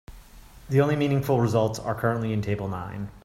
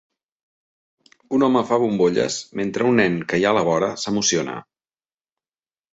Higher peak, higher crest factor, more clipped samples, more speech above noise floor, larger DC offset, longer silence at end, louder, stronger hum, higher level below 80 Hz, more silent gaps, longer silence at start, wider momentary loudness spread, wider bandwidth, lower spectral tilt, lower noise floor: second, -8 dBFS vs -4 dBFS; about the same, 18 dB vs 18 dB; neither; second, 23 dB vs over 71 dB; neither; second, 0.05 s vs 1.3 s; second, -25 LUFS vs -20 LUFS; neither; first, -50 dBFS vs -60 dBFS; neither; second, 0.1 s vs 1.3 s; about the same, 9 LU vs 7 LU; first, 16 kHz vs 8 kHz; first, -7.5 dB/octave vs -4 dB/octave; second, -47 dBFS vs under -90 dBFS